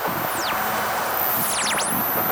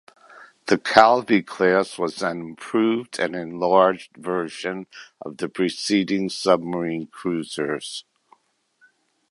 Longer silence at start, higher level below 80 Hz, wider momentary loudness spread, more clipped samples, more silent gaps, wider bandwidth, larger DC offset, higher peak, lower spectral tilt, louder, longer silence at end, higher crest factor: second, 0 s vs 0.35 s; first, -54 dBFS vs -64 dBFS; second, 3 LU vs 15 LU; neither; neither; first, over 20 kHz vs 11.5 kHz; neither; second, -12 dBFS vs 0 dBFS; second, -2 dB/octave vs -4.5 dB/octave; about the same, -21 LUFS vs -22 LUFS; second, 0 s vs 1.3 s; second, 12 dB vs 22 dB